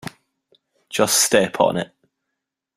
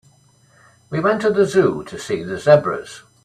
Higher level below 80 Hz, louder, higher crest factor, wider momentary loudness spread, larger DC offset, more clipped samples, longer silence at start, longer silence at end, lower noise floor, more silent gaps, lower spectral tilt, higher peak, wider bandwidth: about the same, -60 dBFS vs -56 dBFS; about the same, -18 LUFS vs -18 LUFS; about the same, 22 dB vs 18 dB; first, 18 LU vs 14 LU; neither; neither; second, 0.05 s vs 0.9 s; first, 0.9 s vs 0.25 s; first, -81 dBFS vs -54 dBFS; neither; second, -2.5 dB/octave vs -6 dB/octave; about the same, 0 dBFS vs 0 dBFS; first, 16 kHz vs 12.5 kHz